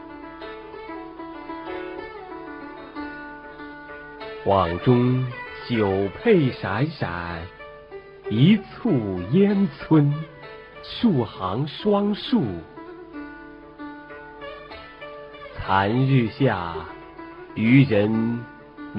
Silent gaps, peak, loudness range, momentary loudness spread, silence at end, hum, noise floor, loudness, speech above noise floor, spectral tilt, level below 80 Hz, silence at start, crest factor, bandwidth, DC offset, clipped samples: none; -4 dBFS; 14 LU; 20 LU; 0 s; none; -42 dBFS; -22 LUFS; 21 dB; -10 dB/octave; -52 dBFS; 0 s; 20 dB; 5.4 kHz; under 0.1%; under 0.1%